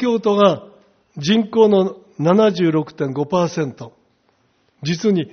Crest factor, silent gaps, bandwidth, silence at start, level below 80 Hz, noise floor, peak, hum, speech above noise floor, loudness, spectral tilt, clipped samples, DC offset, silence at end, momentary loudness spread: 18 dB; none; 6.6 kHz; 0 s; -60 dBFS; -61 dBFS; 0 dBFS; none; 45 dB; -17 LUFS; -5.5 dB/octave; under 0.1%; under 0.1%; 0.05 s; 11 LU